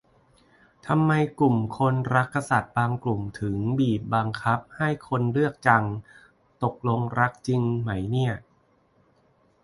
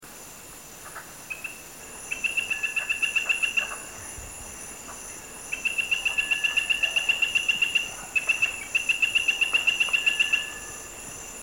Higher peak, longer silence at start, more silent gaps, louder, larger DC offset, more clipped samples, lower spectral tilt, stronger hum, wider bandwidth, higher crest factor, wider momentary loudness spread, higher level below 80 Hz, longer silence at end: first, -4 dBFS vs -10 dBFS; first, 0.85 s vs 0 s; neither; about the same, -25 LUFS vs -23 LUFS; neither; neither; first, -7.5 dB/octave vs 0.5 dB/octave; neither; second, 11.5 kHz vs 17 kHz; about the same, 22 dB vs 18 dB; second, 7 LU vs 18 LU; about the same, -54 dBFS vs -56 dBFS; first, 1.25 s vs 0 s